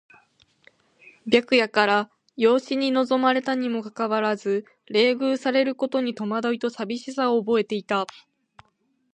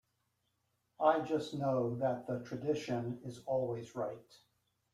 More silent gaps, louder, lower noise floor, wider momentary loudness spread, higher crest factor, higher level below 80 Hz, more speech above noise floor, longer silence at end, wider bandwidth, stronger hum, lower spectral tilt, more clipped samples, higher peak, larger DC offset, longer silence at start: neither; first, -23 LUFS vs -36 LUFS; second, -69 dBFS vs -81 dBFS; second, 8 LU vs 11 LU; about the same, 20 dB vs 22 dB; about the same, -74 dBFS vs -74 dBFS; about the same, 46 dB vs 45 dB; first, 1.1 s vs 0.55 s; second, 9.4 kHz vs 14 kHz; neither; second, -5 dB/octave vs -7 dB/octave; neither; first, -4 dBFS vs -16 dBFS; neither; first, 1.25 s vs 1 s